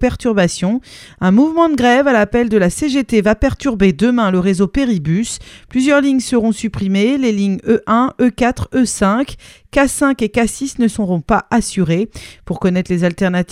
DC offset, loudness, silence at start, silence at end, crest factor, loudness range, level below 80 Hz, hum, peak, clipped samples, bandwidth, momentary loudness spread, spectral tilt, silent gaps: under 0.1%; -15 LUFS; 0 s; 0 s; 14 dB; 3 LU; -34 dBFS; none; 0 dBFS; under 0.1%; 15 kHz; 7 LU; -5.5 dB/octave; none